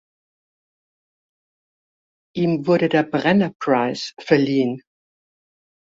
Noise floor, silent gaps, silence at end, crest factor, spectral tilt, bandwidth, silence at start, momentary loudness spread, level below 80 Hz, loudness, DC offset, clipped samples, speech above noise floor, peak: under -90 dBFS; 3.55-3.60 s; 1.15 s; 20 dB; -6.5 dB/octave; 7.8 kHz; 2.35 s; 9 LU; -64 dBFS; -20 LUFS; under 0.1%; under 0.1%; over 71 dB; -2 dBFS